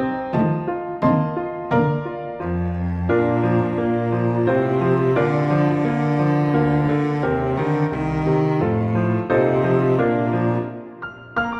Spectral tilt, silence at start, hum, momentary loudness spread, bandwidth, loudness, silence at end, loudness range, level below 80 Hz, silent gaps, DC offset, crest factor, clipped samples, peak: -9.5 dB/octave; 0 s; none; 7 LU; 6.4 kHz; -20 LUFS; 0 s; 2 LU; -44 dBFS; none; under 0.1%; 14 dB; under 0.1%; -6 dBFS